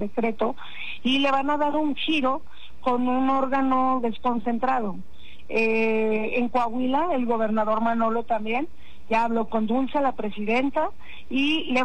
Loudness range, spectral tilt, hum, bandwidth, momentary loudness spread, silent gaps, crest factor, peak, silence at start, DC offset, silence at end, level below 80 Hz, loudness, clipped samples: 1 LU; -6 dB/octave; none; 9 kHz; 7 LU; none; 10 dB; -12 dBFS; 0 s; 3%; 0 s; -54 dBFS; -24 LUFS; under 0.1%